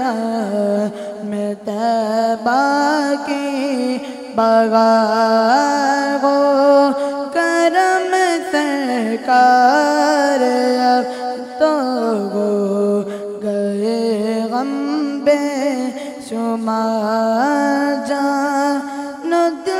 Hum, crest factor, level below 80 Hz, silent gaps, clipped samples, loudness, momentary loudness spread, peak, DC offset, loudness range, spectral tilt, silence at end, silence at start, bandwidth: none; 16 dB; -66 dBFS; none; under 0.1%; -16 LUFS; 10 LU; 0 dBFS; under 0.1%; 5 LU; -4.5 dB/octave; 0 s; 0 s; 15.5 kHz